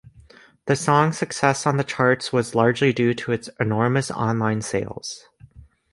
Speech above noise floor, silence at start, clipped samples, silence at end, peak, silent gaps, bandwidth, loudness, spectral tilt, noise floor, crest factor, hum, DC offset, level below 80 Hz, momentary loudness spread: 29 dB; 0.65 s; under 0.1%; 0.3 s; -2 dBFS; none; 11.5 kHz; -21 LUFS; -5.5 dB/octave; -50 dBFS; 20 dB; none; under 0.1%; -56 dBFS; 9 LU